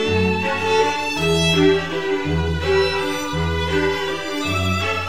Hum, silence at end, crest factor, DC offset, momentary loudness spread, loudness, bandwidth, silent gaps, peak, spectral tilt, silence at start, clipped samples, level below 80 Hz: none; 0 s; 16 dB; 1%; 6 LU; -19 LUFS; 16 kHz; none; -4 dBFS; -5 dB/octave; 0 s; under 0.1%; -36 dBFS